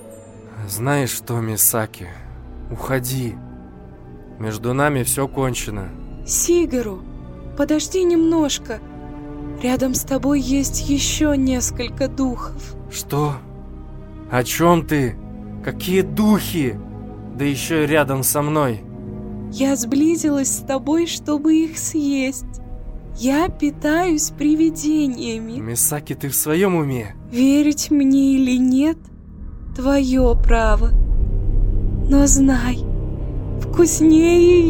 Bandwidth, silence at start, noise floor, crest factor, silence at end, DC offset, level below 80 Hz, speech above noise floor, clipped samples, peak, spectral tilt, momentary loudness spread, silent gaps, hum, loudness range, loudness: 17 kHz; 0 s; -39 dBFS; 18 dB; 0 s; under 0.1%; -26 dBFS; 21 dB; under 0.1%; 0 dBFS; -5 dB/octave; 18 LU; none; none; 5 LU; -18 LUFS